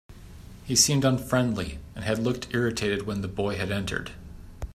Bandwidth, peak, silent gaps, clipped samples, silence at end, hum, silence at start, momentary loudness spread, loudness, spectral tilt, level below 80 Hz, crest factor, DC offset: 15.5 kHz; -6 dBFS; none; under 0.1%; 0 s; none; 0.1 s; 21 LU; -26 LUFS; -4 dB/octave; -46 dBFS; 22 dB; under 0.1%